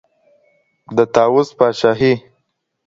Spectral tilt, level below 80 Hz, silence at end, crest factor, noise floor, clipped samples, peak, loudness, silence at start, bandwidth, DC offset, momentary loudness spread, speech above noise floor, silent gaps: -6 dB/octave; -54 dBFS; 0.65 s; 16 dB; -70 dBFS; under 0.1%; 0 dBFS; -15 LUFS; 0.9 s; 7.6 kHz; under 0.1%; 6 LU; 56 dB; none